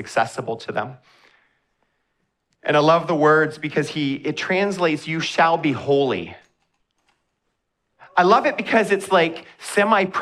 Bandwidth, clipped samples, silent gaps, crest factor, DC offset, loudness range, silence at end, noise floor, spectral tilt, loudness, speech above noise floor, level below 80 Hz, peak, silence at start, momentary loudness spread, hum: 13.5 kHz; under 0.1%; none; 20 dB; under 0.1%; 3 LU; 0 s; -74 dBFS; -5 dB/octave; -20 LUFS; 55 dB; -68 dBFS; -2 dBFS; 0 s; 12 LU; none